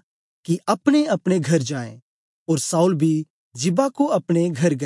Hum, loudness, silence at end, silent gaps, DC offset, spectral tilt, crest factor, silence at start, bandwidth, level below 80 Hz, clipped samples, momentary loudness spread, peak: none; -21 LUFS; 0 s; 2.02-2.46 s, 3.30-3.51 s; under 0.1%; -6 dB/octave; 16 dB; 0.5 s; 11.5 kHz; -72 dBFS; under 0.1%; 12 LU; -4 dBFS